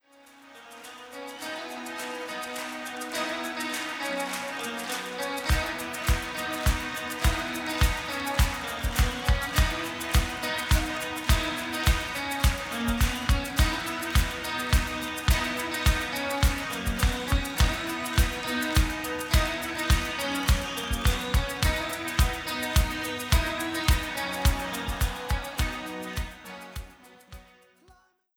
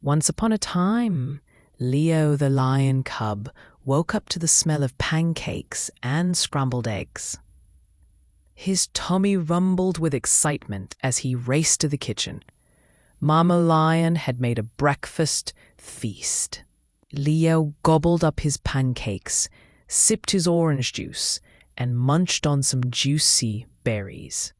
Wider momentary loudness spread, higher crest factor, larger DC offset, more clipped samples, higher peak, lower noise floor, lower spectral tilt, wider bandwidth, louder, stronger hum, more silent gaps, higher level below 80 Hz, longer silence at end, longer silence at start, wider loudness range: second, 9 LU vs 12 LU; about the same, 20 dB vs 22 dB; neither; neither; second, -8 dBFS vs -2 dBFS; about the same, -60 dBFS vs -60 dBFS; about the same, -4 dB/octave vs -4.5 dB/octave; first, over 20 kHz vs 12 kHz; second, -28 LUFS vs -22 LUFS; neither; neither; first, -30 dBFS vs -48 dBFS; first, 0.95 s vs 0.1 s; first, 0.45 s vs 0.05 s; about the same, 5 LU vs 4 LU